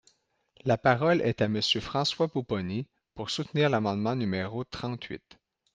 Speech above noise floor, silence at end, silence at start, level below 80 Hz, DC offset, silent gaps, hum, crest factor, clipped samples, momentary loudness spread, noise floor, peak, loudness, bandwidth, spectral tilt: 40 dB; 0.6 s; 0.65 s; -60 dBFS; under 0.1%; none; none; 22 dB; under 0.1%; 12 LU; -68 dBFS; -8 dBFS; -28 LUFS; 9.8 kHz; -5.5 dB/octave